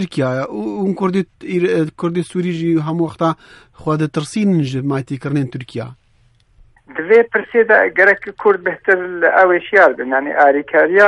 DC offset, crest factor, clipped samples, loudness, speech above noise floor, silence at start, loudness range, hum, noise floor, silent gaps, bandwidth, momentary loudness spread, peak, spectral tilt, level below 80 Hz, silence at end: under 0.1%; 16 dB; under 0.1%; -15 LUFS; 39 dB; 0 s; 8 LU; none; -54 dBFS; none; 11.5 kHz; 11 LU; 0 dBFS; -7 dB/octave; -56 dBFS; 0 s